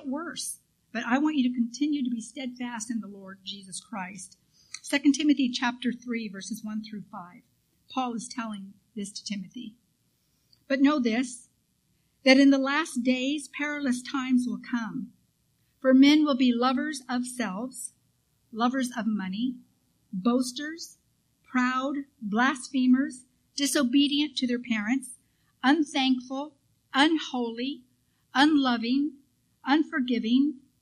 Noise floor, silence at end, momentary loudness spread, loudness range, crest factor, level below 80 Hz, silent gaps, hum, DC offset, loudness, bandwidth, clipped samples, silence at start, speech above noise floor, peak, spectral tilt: -71 dBFS; 0.25 s; 17 LU; 8 LU; 22 dB; -72 dBFS; none; none; under 0.1%; -27 LUFS; 14 kHz; under 0.1%; 0 s; 44 dB; -6 dBFS; -3.5 dB/octave